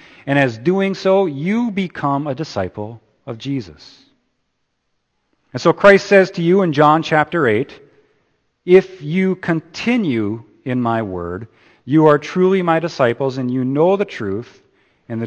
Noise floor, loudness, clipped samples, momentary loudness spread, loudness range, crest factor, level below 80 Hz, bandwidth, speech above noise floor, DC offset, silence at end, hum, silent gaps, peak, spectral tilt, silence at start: -70 dBFS; -16 LUFS; under 0.1%; 16 LU; 10 LU; 18 dB; -56 dBFS; 8.6 kHz; 54 dB; under 0.1%; 0 s; none; none; 0 dBFS; -7 dB/octave; 0.25 s